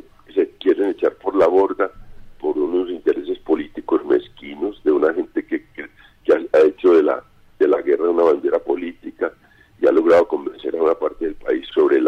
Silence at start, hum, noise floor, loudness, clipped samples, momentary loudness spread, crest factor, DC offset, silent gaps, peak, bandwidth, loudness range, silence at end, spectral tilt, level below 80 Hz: 0.35 s; none; -51 dBFS; -19 LUFS; under 0.1%; 13 LU; 12 dB; under 0.1%; none; -6 dBFS; 6.4 kHz; 4 LU; 0 s; -6.5 dB/octave; -50 dBFS